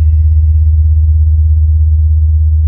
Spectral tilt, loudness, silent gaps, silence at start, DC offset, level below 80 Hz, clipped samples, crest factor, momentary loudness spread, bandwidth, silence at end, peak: -14.5 dB/octave; -10 LUFS; none; 0 s; under 0.1%; -12 dBFS; under 0.1%; 6 dB; 1 LU; 0.4 kHz; 0 s; -2 dBFS